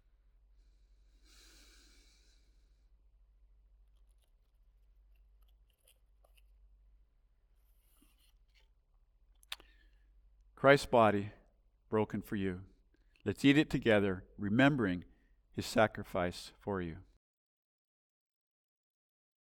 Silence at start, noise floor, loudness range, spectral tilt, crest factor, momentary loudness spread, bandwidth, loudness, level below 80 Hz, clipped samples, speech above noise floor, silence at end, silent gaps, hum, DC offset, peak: 9.5 s; -70 dBFS; 7 LU; -6 dB/octave; 26 dB; 20 LU; 17.5 kHz; -32 LUFS; -62 dBFS; under 0.1%; 39 dB; 2.45 s; none; none; under 0.1%; -12 dBFS